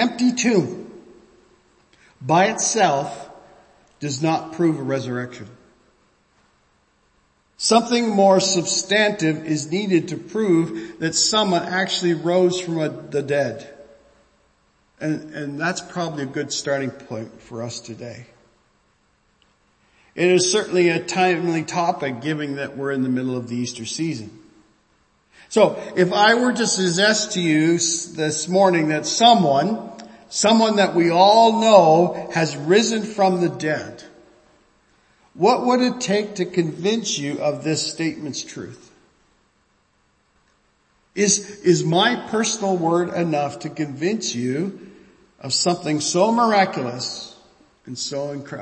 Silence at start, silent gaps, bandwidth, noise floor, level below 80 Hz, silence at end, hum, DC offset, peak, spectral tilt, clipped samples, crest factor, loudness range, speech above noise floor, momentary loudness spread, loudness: 0 s; none; 8.8 kHz; -63 dBFS; -64 dBFS; 0 s; none; under 0.1%; 0 dBFS; -4 dB/octave; under 0.1%; 20 dB; 11 LU; 44 dB; 14 LU; -19 LUFS